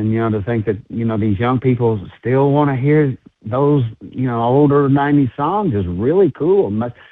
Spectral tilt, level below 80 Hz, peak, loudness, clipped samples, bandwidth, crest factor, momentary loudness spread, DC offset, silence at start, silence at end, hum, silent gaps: -11.5 dB/octave; -46 dBFS; -2 dBFS; -16 LUFS; under 0.1%; 4 kHz; 14 dB; 8 LU; under 0.1%; 0 s; 0.2 s; none; none